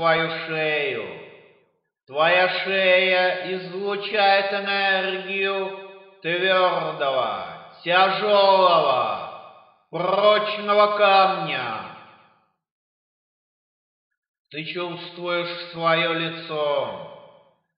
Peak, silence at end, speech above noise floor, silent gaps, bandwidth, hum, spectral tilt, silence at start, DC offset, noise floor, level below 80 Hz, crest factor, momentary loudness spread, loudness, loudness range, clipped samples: -4 dBFS; 0.5 s; 43 dB; 12.71-14.10 s, 14.17-14.22 s, 14.28-14.34 s, 14.40-14.45 s; 5.4 kHz; none; -7 dB/octave; 0 s; under 0.1%; -64 dBFS; -76 dBFS; 18 dB; 16 LU; -21 LUFS; 13 LU; under 0.1%